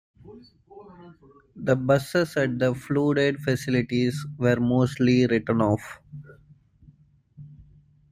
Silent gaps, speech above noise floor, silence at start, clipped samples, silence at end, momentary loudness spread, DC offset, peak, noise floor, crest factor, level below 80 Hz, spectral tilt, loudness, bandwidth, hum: none; 32 dB; 0.25 s; under 0.1%; 0.5 s; 9 LU; under 0.1%; -8 dBFS; -56 dBFS; 18 dB; -56 dBFS; -7 dB/octave; -24 LUFS; 15.5 kHz; none